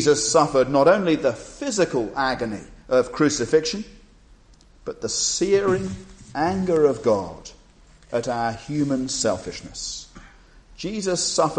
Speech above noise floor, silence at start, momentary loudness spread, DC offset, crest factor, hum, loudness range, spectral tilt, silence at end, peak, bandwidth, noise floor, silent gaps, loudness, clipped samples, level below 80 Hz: 30 dB; 0 s; 16 LU; under 0.1%; 18 dB; none; 6 LU; -4 dB/octave; 0 s; -4 dBFS; 9.8 kHz; -52 dBFS; none; -22 LUFS; under 0.1%; -50 dBFS